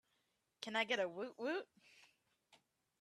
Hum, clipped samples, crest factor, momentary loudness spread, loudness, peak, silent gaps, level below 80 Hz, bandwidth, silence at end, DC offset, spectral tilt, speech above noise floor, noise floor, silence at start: none; under 0.1%; 22 dB; 12 LU; -42 LUFS; -24 dBFS; none; under -90 dBFS; 13.5 kHz; 0.95 s; under 0.1%; -3 dB/octave; 42 dB; -84 dBFS; 0.6 s